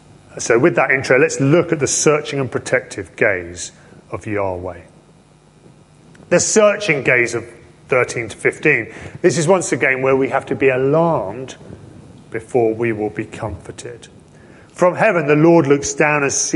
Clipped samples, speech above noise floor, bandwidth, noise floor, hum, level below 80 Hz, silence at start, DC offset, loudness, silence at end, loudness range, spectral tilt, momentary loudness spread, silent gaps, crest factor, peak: under 0.1%; 32 dB; 11.5 kHz; -49 dBFS; none; -48 dBFS; 0.35 s; under 0.1%; -16 LUFS; 0 s; 8 LU; -4.5 dB/octave; 17 LU; none; 16 dB; 0 dBFS